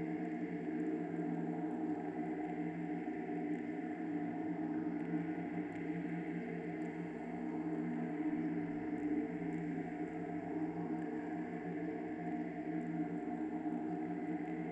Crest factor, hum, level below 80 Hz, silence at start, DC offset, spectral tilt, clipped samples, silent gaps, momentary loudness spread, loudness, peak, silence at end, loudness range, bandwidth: 14 dB; none; -72 dBFS; 0 s; under 0.1%; -9 dB/octave; under 0.1%; none; 3 LU; -41 LUFS; -26 dBFS; 0 s; 1 LU; 8 kHz